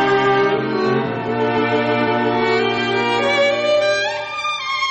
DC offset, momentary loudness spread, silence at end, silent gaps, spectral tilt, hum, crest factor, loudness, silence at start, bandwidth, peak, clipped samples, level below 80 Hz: under 0.1%; 5 LU; 0 s; none; -5 dB/octave; none; 10 dB; -17 LUFS; 0 s; 8.6 kHz; -6 dBFS; under 0.1%; -54 dBFS